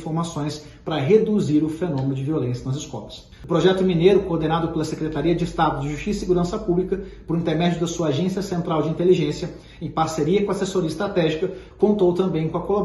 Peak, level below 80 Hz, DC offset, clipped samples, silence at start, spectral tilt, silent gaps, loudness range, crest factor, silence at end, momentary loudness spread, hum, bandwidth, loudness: -4 dBFS; -44 dBFS; under 0.1%; under 0.1%; 0 s; -6.5 dB/octave; none; 2 LU; 18 dB; 0 s; 11 LU; none; 12 kHz; -22 LUFS